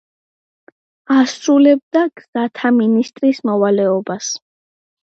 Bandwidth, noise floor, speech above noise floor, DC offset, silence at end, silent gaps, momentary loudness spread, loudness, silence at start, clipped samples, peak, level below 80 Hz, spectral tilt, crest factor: 8 kHz; under -90 dBFS; over 75 dB; under 0.1%; 0.65 s; 1.83-1.91 s, 2.28-2.33 s; 10 LU; -15 LUFS; 1.1 s; under 0.1%; -2 dBFS; -72 dBFS; -5 dB/octave; 14 dB